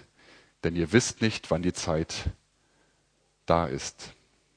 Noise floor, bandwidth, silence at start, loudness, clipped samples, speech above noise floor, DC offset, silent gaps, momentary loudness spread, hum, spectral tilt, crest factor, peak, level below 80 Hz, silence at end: -69 dBFS; 10.5 kHz; 0.65 s; -28 LUFS; under 0.1%; 42 dB; under 0.1%; none; 14 LU; none; -4.5 dB/octave; 24 dB; -6 dBFS; -46 dBFS; 0.45 s